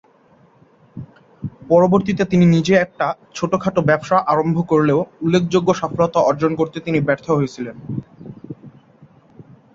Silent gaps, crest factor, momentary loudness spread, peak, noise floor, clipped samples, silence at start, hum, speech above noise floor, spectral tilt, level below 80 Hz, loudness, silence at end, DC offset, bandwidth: none; 16 dB; 22 LU; -2 dBFS; -52 dBFS; under 0.1%; 0.95 s; none; 36 dB; -7 dB/octave; -52 dBFS; -17 LUFS; 1.05 s; under 0.1%; 7.6 kHz